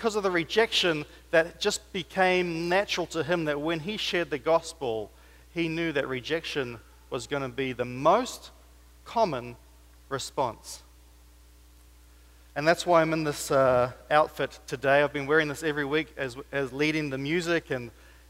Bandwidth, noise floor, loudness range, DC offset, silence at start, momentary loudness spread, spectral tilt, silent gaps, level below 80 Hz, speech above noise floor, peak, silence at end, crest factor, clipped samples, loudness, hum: 16 kHz; -54 dBFS; 8 LU; under 0.1%; 0 s; 13 LU; -4.5 dB/octave; none; -54 dBFS; 27 dB; -8 dBFS; 0.4 s; 20 dB; under 0.1%; -27 LUFS; none